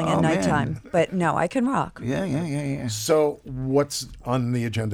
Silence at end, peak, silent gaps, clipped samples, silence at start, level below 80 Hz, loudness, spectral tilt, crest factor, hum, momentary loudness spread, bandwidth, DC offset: 0 s; -8 dBFS; none; under 0.1%; 0 s; -48 dBFS; -24 LUFS; -5.5 dB/octave; 16 dB; none; 7 LU; 17.5 kHz; under 0.1%